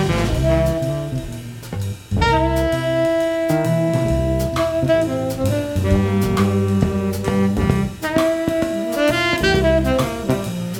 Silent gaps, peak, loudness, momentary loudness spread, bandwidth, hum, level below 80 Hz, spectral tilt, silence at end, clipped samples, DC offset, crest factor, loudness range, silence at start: none; -2 dBFS; -19 LUFS; 6 LU; 18.5 kHz; none; -30 dBFS; -6.5 dB/octave; 0 s; under 0.1%; under 0.1%; 16 dB; 2 LU; 0 s